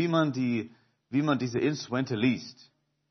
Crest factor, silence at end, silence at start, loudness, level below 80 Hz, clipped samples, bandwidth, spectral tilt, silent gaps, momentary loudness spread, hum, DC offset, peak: 18 dB; 0.6 s; 0 s; -29 LUFS; -72 dBFS; under 0.1%; 6.4 kHz; -6.5 dB/octave; none; 8 LU; none; under 0.1%; -12 dBFS